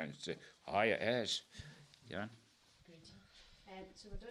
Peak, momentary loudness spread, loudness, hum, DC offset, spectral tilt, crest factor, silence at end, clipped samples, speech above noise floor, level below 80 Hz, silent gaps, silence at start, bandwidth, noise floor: -18 dBFS; 26 LU; -39 LUFS; none; under 0.1%; -4 dB/octave; 24 dB; 0 s; under 0.1%; 27 dB; -62 dBFS; none; 0 s; 13 kHz; -67 dBFS